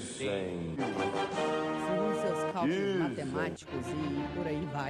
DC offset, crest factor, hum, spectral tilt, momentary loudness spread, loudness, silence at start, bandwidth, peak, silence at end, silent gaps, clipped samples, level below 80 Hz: under 0.1%; 10 dB; none; -5.5 dB/octave; 5 LU; -33 LUFS; 0 s; 12.5 kHz; -22 dBFS; 0 s; none; under 0.1%; -60 dBFS